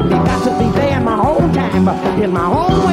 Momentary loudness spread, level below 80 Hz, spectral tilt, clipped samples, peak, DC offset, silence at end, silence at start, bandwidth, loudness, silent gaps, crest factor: 2 LU; -30 dBFS; -7.5 dB/octave; under 0.1%; 0 dBFS; under 0.1%; 0 s; 0 s; 13 kHz; -14 LUFS; none; 12 dB